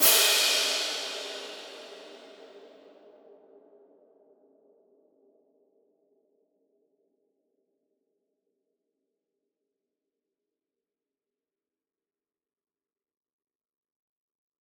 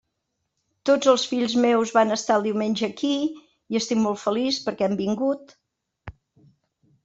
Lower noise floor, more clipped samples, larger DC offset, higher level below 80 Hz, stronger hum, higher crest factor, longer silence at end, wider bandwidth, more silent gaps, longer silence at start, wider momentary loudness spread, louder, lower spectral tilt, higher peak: first, under -90 dBFS vs -79 dBFS; neither; neither; second, under -90 dBFS vs -62 dBFS; neither; first, 30 dB vs 20 dB; first, 11.95 s vs 0.95 s; first, over 20 kHz vs 8 kHz; neither; second, 0 s vs 0.85 s; first, 28 LU vs 7 LU; about the same, -24 LUFS vs -23 LUFS; second, 2.5 dB/octave vs -4.5 dB/octave; about the same, -6 dBFS vs -4 dBFS